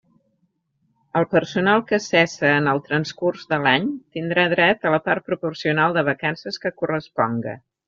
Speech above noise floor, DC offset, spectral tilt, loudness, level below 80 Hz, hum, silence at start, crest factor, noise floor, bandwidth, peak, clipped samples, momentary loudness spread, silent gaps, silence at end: 48 dB; under 0.1%; -3.5 dB/octave; -21 LUFS; -62 dBFS; none; 1.15 s; 20 dB; -69 dBFS; 7.6 kHz; -2 dBFS; under 0.1%; 9 LU; none; 0.3 s